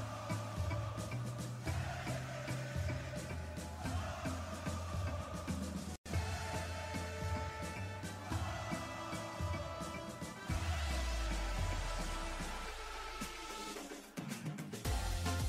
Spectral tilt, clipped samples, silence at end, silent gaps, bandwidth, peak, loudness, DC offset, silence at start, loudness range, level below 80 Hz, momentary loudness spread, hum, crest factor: -5 dB/octave; under 0.1%; 0 s; 5.98-6.04 s; 16 kHz; -28 dBFS; -42 LUFS; under 0.1%; 0 s; 2 LU; -46 dBFS; 5 LU; none; 14 dB